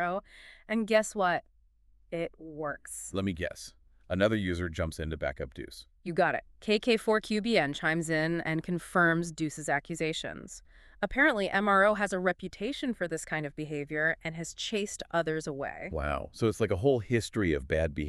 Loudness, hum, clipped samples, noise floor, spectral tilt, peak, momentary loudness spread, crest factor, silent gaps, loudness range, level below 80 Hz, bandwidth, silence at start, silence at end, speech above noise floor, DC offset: -30 LUFS; none; under 0.1%; -64 dBFS; -5 dB/octave; -10 dBFS; 12 LU; 20 dB; none; 5 LU; -50 dBFS; 13.5 kHz; 0 s; 0 s; 33 dB; under 0.1%